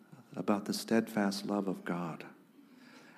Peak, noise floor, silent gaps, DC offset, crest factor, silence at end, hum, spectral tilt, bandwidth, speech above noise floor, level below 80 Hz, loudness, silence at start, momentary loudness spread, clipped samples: -16 dBFS; -59 dBFS; none; under 0.1%; 20 dB; 0.05 s; none; -5.5 dB/octave; 15.5 kHz; 25 dB; -86 dBFS; -35 LUFS; 0.1 s; 15 LU; under 0.1%